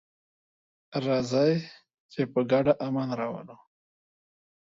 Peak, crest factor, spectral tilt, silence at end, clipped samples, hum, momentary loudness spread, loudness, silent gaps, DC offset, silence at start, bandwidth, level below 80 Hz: -10 dBFS; 20 dB; -7 dB/octave; 1.15 s; under 0.1%; none; 14 LU; -27 LUFS; 2.00-2.09 s; under 0.1%; 0.9 s; 7.8 kHz; -66 dBFS